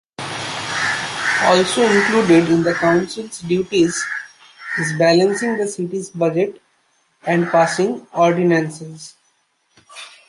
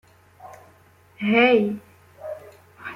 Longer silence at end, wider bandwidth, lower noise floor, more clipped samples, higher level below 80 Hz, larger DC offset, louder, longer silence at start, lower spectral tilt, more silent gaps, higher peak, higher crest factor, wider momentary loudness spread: first, 0.2 s vs 0 s; second, 11.5 kHz vs 14.5 kHz; first, -63 dBFS vs -54 dBFS; neither; first, -58 dBFS vs -68 dBFS; neither; about the same, -17 LUFS vs -19 LUFS; second, 0.2 s vs 0.45 s; second, -4.5 dB/octave vs -6.5 dB/octave; neither; first, -2 dBFS vs -6 dBFS; about the same, 16 dB vs 20 dB; second, 14 LU vs 23 LU